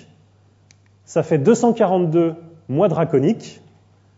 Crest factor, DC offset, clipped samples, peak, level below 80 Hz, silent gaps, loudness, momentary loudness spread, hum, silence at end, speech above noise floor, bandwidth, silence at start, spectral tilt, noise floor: 18 dB; under 0.1%; under 0.1%; -2 dBFS; -64 dBFS; none; -18 LUFS; 11 LU; 50 Hz at -45 dBFS; 0.65 s; 37 dB; 8 kHz; 1.1 s; -7.5 dB/octave; -54 dBFS